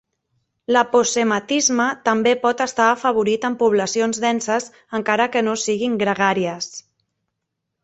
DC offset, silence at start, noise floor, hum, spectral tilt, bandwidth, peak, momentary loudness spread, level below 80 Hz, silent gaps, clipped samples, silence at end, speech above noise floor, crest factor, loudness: under 0.1%; 0.7 s; -79 dBFS; none; -3 dB/octave; 8.4 kHz; -2 dBFS; 8 LU; -64 dBFS; none; under 0.1%; 1.05 s; 60 dB; 18 dB; -19 LUFS